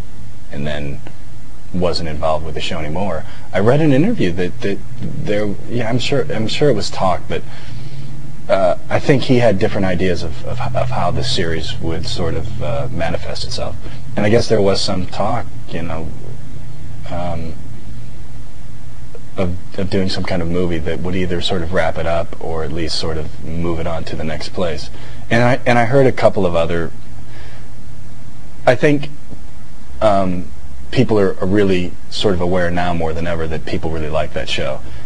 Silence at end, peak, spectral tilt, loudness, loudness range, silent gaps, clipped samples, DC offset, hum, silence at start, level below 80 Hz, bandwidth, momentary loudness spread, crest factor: 0 s; 0 dBFS; -6 dB/octave; -19 LUFS; 6 LU; none; under 0.1%; 20%; none; 0 s; -36 dBFS; 10.5 kHz; 21 LU; 20 dB